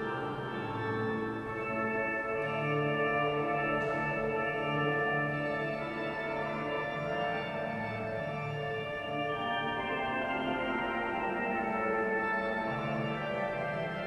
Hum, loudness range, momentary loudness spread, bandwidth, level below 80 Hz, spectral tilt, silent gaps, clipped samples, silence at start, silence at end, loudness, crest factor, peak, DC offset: none; 4 LU; 5 LU; 12.5 kHz; -60 dBFS; -7 dB/octave; none; under 0.1%; 0 s; 0 s; -33 LUFS; 14 dB; -20 dBFS; under 0.1%